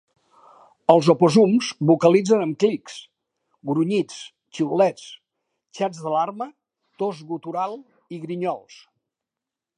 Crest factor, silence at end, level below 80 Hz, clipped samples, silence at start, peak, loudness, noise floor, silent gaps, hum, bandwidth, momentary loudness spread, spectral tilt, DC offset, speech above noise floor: 22 dB; 1.2 s; -72 dBFS; under 0.1%; 0.9 s; 0 dBFS; -21 LUFS; -87 dBFS; none; none; 11 kHz; 22 LU; -6.5 dB/octave; under 0.1%; 67 dB